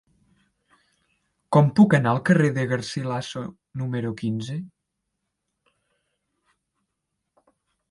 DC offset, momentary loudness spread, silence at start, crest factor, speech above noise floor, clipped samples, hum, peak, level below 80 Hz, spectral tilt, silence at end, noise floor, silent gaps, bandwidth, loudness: under 0.1%; 17 LU; 1.5 s; 22 dB; 58 dB; under 0.1%; none; -4 dBFS; -64 dBFS; -7 dB/octave; 3.25 s; -80 dBFS; none; 11.5 kHz; -22 LUFS